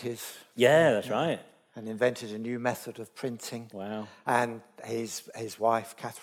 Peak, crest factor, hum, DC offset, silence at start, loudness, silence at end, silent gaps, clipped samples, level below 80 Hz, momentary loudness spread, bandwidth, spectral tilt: -8 dBFS; 22 dB; none; under 0.1%; 0 s; -30 LUFS; 0 s; none; under 0.1%; -78 dBFS; 18 LU; 17.5 kHz; -4.5 dB/octave